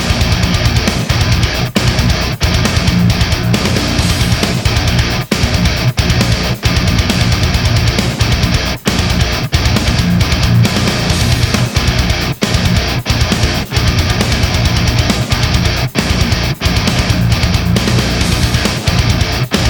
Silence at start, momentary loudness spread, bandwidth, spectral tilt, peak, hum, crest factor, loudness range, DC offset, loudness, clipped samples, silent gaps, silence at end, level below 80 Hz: 0 s; 2 LU; over 20 kHz; -4.5 dB/octave; 0 dBFS; none; 12 dB; 1 LU; under 0.1%; -13 LUFS; under 0.1%; none; 0 s; -20 dBFS